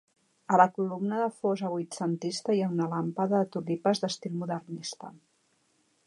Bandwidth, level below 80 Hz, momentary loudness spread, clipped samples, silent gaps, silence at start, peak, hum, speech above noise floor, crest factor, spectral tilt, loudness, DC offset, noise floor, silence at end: 11.5 kHz; -80 dBFS; 12 LU; under 0.1%; none; 0.5 s; -6 dBFS; none; 42 dB; 24 dB; -6 dB/octave; -29 LUFS; under 0.1%; -71 dBFS; 0.9 s